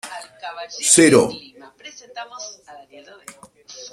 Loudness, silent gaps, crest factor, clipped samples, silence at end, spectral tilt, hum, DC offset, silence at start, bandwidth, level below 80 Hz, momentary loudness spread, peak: -14 LUFS; none; 22 dB; under 0.1%; 0.05 s; -3 dB/octave; none; under 0.1%; 0.05 s; 15 kHz; -60 dBFS; 28 LU; 0 dBFS